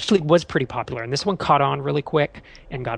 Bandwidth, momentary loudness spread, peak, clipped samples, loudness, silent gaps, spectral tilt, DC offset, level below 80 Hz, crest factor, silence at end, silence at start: 10.5 kHz; 10 LU; -4 dBFS; under 0.1%; -21 LUFS; none; -5.5 dB/octave; under 0.1%; -48 dBFS; 18 dB; 0 s; 0 s